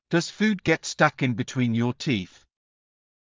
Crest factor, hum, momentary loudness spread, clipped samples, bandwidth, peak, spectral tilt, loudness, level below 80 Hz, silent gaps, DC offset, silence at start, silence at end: 22 dB; none; 6 LU; under 0.1%; 7.6 kHz; -4 dBFS; -5.5 dB/octave; -24 LUFS; -58 dBFS; none; under 0.1%; 0.1 s; 1.05 s